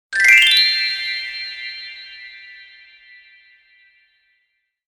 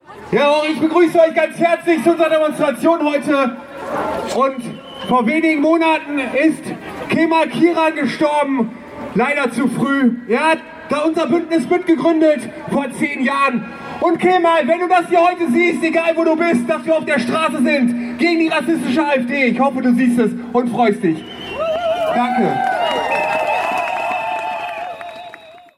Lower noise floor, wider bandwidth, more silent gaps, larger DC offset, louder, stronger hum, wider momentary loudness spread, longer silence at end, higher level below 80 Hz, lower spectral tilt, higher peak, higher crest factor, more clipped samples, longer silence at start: first, -70 dBFS vs -39 dBFS; first, 17 kHz vs 14 kHz; neither; neither; first, -13 LUFS vs -16 LUFS; neither; first, 27 LU vs 9 LU; first, 2.25 s vs 0.2 s; about the same, -60 dBFS vs -56 dBFS; second, 3.5 dB/octave vs -5.5 dB/octave; about the same, 0 dBFS vs -2 dBFS; first, 20 dB vs 14 dB; neither; about the same, 0.1 s vs 0.1 s